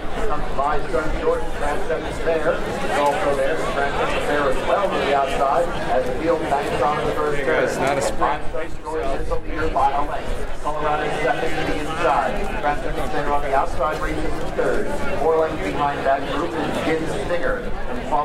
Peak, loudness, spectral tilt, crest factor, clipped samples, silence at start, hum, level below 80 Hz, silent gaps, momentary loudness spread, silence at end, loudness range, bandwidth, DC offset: -6 dBFS; -22 LUFS; -5 dB/octave; 14 dB; under 0.1%; 0 s; none; -30 dBFS; none; 6 LU; 0 s; 3 LU; 13 kHz; under 0.1%